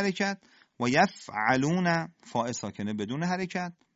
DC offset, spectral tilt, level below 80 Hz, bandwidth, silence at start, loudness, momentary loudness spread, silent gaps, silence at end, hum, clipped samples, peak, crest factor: under 0.1%; -5 dB/octave; -66 dBFS; 8 kHz; 0 s; -29 LUFS; 9 LU; none; 0.25 s; none; under 0.1%; -8 dBFS; 20 dB